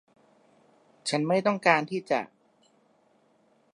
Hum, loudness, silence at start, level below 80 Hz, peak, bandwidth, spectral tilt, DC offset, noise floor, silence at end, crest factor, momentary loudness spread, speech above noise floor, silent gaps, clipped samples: none; -26 LUFS; 1.05 s; -82 dBFS; -6 dBFS; 11.5 kHz; -4.5 dB/octave; under 0.1%; -65 dBFS; 1.5 s; 24 dB; 10 LU; 40 dB; none; under 0.1%